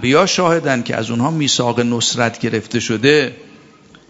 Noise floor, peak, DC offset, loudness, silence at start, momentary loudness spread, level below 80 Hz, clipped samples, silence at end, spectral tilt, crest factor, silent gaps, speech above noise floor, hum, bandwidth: -45 dBFS; 0 dBFS; under 0.1%; -16 LUFS; 0 s; 7 LU; -54 dBFS; under 0.1%; 0.65 s; -4 dB/octave; 16 dB; none; 29 dB; none; 8 kHz